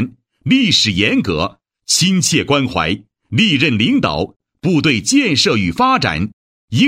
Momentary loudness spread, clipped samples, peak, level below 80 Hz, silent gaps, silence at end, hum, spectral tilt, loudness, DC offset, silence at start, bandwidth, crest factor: 11 LU; under 0.1%; 0 dBFS; -42 dBFS; 4.36-4.40 s, 6.33-6.68 s; 0 s; none; -4 dB/octave; -14 LUFS; under 0.1%; 0 s; 16 kHz; 16 dB